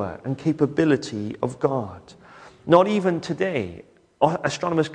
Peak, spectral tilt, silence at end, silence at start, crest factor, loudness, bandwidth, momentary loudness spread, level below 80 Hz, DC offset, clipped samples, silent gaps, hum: -2 dBFS; -6.5 dB/octave; 0 s; 0 s; 22 dB; -23 LUFS; 10 kHz; 11 LU; -58 dBFS; under 0.1%; under 0.1%; none; none